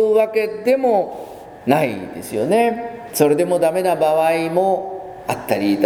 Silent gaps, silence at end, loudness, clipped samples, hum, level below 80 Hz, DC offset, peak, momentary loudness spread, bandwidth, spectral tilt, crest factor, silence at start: none; 0 s; -18 LUFS; under 0.1%; none; -58 dBFS; under 0.1%; 0 dBFS; 12 LU; over 20 kHz; -5.5 dB/octave; 18 dB; 0 s